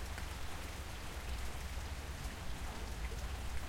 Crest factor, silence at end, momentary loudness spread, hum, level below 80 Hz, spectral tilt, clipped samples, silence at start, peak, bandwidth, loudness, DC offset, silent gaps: 16 dB; 0 s; 2 LU; none; -46 dBFS; -4 dB/octave; under 0.1%; 0 s; -26 dBFS; 16.5 kHz; -45 LUFS; under 0.1%; none